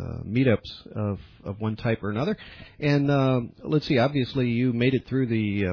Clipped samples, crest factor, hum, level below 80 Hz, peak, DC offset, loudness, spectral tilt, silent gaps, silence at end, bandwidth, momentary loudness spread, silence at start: under 0.1%; 16 dB; none; -52 dBFS; -8 dBFS; under 0.1%; -25 LUFS; -8.5 dB/octave; none; 0 s; 5.4 kHz; 10 LU; 0 s